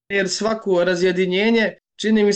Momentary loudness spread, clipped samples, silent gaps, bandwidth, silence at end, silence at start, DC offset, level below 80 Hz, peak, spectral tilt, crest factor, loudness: 5 LU; under 0.1%; none; 9.2 kHz; 0 s; 0.1 s; 0.1%; -58 dBFS; -8 dBFS; -4.5 dB/octave; 10 dB; -19 LUFS